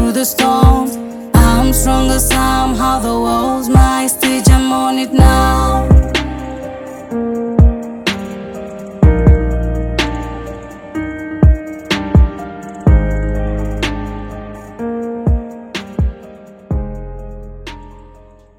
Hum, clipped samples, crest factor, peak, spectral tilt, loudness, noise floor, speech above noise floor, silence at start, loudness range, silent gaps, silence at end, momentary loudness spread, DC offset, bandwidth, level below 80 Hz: none; 0.2%; 14 dB; 0 dBFS; -5.5 dB/octave; -14 LUFS; -41 dBFS; 30 dB; 0 s; 10 LU; none; 0.5 s; 17 LU; under 0.1%; 18.5 kHz; -18 dBFS